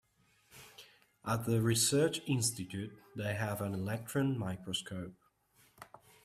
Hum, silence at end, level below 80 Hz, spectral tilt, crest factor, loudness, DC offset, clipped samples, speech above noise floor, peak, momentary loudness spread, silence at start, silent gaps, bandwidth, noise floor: none; 0.4 s; -68 dBFS; -4.5 dB/octave; 18 dB; -35 LUFS; under 0.1%; under 0.1%; 37 dB; -18 dBFS; 25 LU; 0.55 s; none; 16 kHz; -71 dBFS